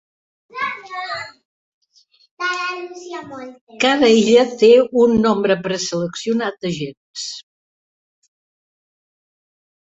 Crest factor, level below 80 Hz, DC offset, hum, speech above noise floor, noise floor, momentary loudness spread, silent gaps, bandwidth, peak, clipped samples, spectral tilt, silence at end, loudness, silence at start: 18 dB; -58 dBFS; under 0.1%; none; 40 dB; -57 dBFS; 20 LU; 1.45-1.81 s, 2.31-2.37 s, 3.61-3.67 s, 6.97-7.14 s; 8 kHz; -2 dBFS; under 0.1%; -4.5 dB/octave; 2.45 s; -17 LUFS; 0.55 s